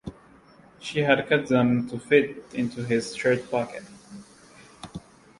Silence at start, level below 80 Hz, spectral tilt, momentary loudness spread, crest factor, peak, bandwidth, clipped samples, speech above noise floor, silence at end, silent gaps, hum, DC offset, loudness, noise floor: 0.05 s; -60 dBFS; -6 dB/octave; 23 LU; 22 dB; -6 dBFS; 11.5 kHz; under 0.1%; 29 dB; 0.4 s; none; none; under 0.1%; -24 LUFS; -53 dBFS